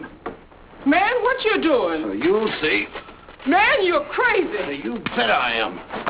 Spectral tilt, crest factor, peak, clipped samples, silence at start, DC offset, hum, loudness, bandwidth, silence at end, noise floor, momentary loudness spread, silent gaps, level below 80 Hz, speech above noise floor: -7.5 dB/octave; 16 dB; -6 dBFS; under 0.1%; 0 s; under 0.1%; none; -20 LUFS; 4 kHz; 0 s; -43 dBFS; 12 LU; none; -50 dBFS; 23 dB